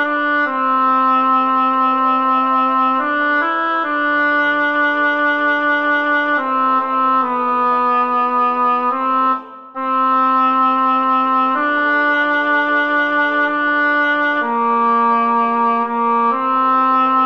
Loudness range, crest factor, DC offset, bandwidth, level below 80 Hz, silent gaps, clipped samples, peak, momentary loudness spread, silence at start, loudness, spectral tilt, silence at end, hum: 1 LU; 10 dB; 0.3%; 6.2 kHz; -74 dBFS; none; under 0.1%; -4 dBFS; 3 LU; 0 s; -15 LUFS; -5 dB/octave; 0 s; none